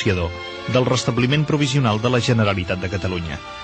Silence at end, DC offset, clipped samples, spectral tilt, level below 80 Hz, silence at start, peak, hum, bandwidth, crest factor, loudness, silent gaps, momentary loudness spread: 0 s; under 0.1%; under 0.1%; -5.5 dB/octave; -42 dBFS; 0 s; -4 dBFS; none; 8.8 kHz; 16 dB; -20 LUFS; none; 8 LU